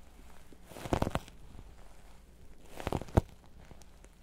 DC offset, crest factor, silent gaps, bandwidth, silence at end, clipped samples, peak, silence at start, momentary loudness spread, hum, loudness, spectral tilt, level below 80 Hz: under 0.1%; 28 dB; none; 16 kHz; 0 s; under 0.1%; -10 dBFS; 0 s; 25 LU; none; -36 LUFS; -6.5 dB/octave; -46 dBFS